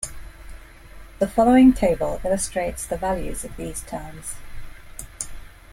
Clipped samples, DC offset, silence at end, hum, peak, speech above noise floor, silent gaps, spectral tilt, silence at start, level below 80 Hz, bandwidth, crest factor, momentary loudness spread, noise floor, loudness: under 0.1%; under 0.1%; 0.25 s; none; -6 dBFS; 21 dB; none; -5 dB/octave; 0 s; -38 dBFS; 16 kHz; 18 dB; 20 LU; -42 dBFS; -21 LUFS